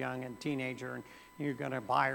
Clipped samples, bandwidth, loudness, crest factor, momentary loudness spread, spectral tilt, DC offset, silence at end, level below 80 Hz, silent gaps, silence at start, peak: under 0.1%; 18.5 kHz; -37 LUFS; 22 dB; 12 LU; -6 dB/octave; under 0.1%; 0 s; -72 dBFS; none; 0 s; -14 dBFS